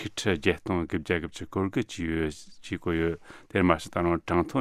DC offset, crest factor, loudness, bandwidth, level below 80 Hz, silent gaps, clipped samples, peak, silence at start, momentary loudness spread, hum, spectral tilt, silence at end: under 0.1%; 24 dB; -28 LUFS; 14 kHz; -48 dBFS; none; under 0.1%; -4 dBFS; 0 s; 9 LU; none; -6 dB/octave; 0 s